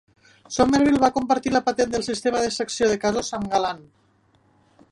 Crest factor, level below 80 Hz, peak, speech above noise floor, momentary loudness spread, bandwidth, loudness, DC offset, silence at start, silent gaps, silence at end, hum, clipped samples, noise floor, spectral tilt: 20 dB; -50 dBFS; -4 dBFS; 40 dB; 8 LU; 11.5 kHz; -22 LUFS; under 0.1%; 0.5 s; none; 1.1 s; none; under 0.1%; -61 dBFS; -4 dB/octave